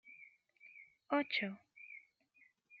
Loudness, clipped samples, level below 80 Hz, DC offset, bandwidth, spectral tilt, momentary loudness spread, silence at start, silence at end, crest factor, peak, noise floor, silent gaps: -38 LUFS; under 0.1%; under -90 dBFS; under 0.1%; 7 kHz; -2 dB/octave; 25 LU; 0.05 s; 0 s; 22 dB; -22 dBFS; -72 dBFS; none